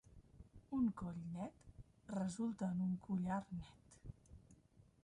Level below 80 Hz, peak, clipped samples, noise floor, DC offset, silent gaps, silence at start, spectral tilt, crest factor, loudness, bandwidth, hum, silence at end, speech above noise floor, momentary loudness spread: -66 dBFS; -30 dBFS; under 0.1%; -69 dBFS; under 0.1%; none; 0.1 s; -7.5 dB/octave; 16 dB; -44 LUFS; 11 kHz; none; 0.5 s; 26 dB; 23 LU